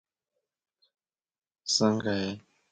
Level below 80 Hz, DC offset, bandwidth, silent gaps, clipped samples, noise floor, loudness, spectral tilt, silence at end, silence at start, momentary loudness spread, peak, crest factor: -66 dBFS; under 0.1%; 9.2 kHz; none; under 0.1%; -85 dBFS; -28 LUFS; -4 dB/octave; 0.3 s; 1.65 s; 16 LU; -12 dBFS; 22 dB